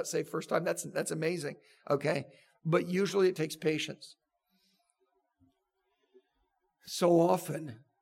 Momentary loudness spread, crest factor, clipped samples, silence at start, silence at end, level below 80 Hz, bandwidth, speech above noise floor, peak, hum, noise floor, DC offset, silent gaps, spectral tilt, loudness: 15 LU; 20 dB; under 0.1%; 0 s; 0.25 s; -84 dBFS; 16.5 kHz; 49 dB; -14 dBFS; none; -80 dBFS; under 0.1%; none; -5 dB/octave; -32 LUFS